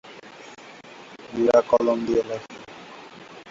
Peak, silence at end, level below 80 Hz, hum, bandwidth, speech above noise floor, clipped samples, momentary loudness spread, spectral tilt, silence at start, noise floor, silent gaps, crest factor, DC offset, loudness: -4 dBFS; 0 s; -60 dBFS; none; 7.8 kHz; 23 dB; under 0.1%; 24 LU; -5.5 dB/octave; 0.05 s; -44 dBFS; none; 20 dB; under 0.1%; -22 LUFS